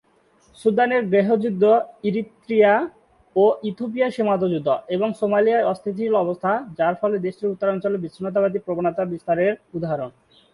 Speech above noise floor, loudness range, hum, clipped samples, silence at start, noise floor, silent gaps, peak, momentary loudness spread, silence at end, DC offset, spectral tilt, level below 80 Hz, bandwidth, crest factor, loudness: 38 dB; 3 LU; none; under 0.1%; 0.6 s; -59 dBFS; none; -6 dBFS; 9 LU; 0.45 s; under 0.1%; -8 dB/octave; -64 dBFS; 11 kHz; 16 dB; -21 LUFS